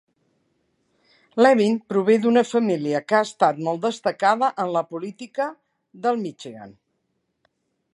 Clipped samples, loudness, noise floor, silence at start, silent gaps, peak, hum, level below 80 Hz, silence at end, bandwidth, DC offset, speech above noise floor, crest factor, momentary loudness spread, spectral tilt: under 0.1%; -21 LUFS; -74 dBFS; 1.35 s; none; -2 dBFS; none; -74 dBFS; 1.25 s; 11 kHz; under 0.1%; 53 dB; 20 dB; 14 LU; -5.5 dB/octave